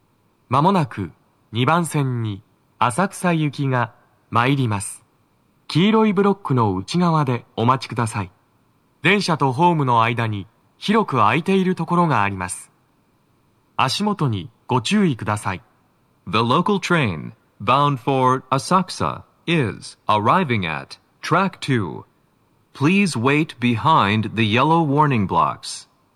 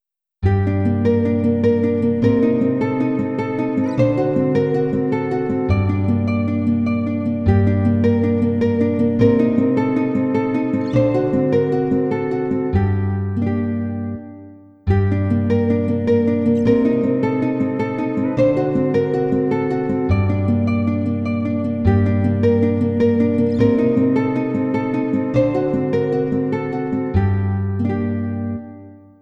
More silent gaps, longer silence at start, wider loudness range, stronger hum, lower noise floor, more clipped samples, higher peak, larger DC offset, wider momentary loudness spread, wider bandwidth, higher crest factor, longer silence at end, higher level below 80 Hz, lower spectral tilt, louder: neither; about the same, 0.5 s vs 0.4 s; about the same, 4 LU vs 3 LU; neither; first, -61 dBFS vs -41 dBFS; neither; about the same, 0 dBFS vs -2 dBFS; neither; first, 13 LU vs 5 LU; first, 13.5 kHz vs 6 kHz; about the same, 20 dB vs 16 dB; about the same, 0.35 s vs 0.25 s; second, -60 dBFS vs -40 dBFS; second, -6 dB/octave vs -10 dB/octave; about the same, -19 LUFS vs -18 LUFS